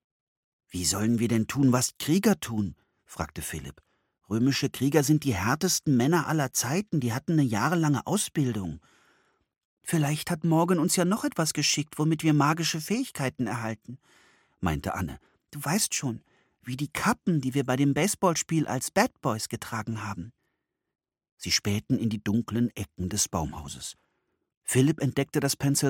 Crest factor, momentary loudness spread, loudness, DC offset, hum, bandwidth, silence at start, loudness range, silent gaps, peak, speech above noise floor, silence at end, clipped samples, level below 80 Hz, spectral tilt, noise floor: 20 dB; 13 LU; -27 LUFS; under 0.1%; none; 17.5 kHz; 0.75 s; 5 LU; 9.65-9.77 s, 21.32-21.37 s, 24.57-24.61 s; -8 dBFS; 54 dB; 0 s; under 0.1%; -54 dBFS; -4.5 dB/octave; -81 dBFS